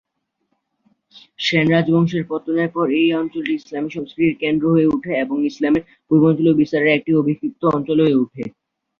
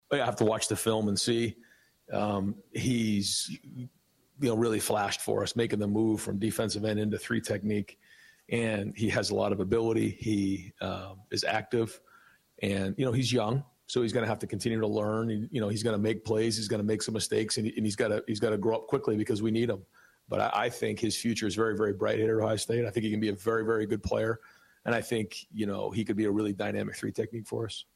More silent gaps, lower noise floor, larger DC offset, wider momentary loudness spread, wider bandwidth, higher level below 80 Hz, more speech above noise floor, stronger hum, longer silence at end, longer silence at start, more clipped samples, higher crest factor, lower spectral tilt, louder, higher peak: neither; first, -71 dBFS vs -61 dBFS; neither; about the same, 8 LU vs 7 LU; second, 7 kHz vs 16 kHz; about the same, -56 dBFS vs -60 dBFS; first, 54 dB vs 31 dB; neither; first, 0.5 s vs 0.15 s; first, 1.4 s vs 0.1 s; neither; about the same, 16 dB vs 16 dB; first, -7.5 dB/octave vs -5 dB/octave; first, -18 LUFS vs -30 LUFS; first, -2 dBFS vs -14 dBFS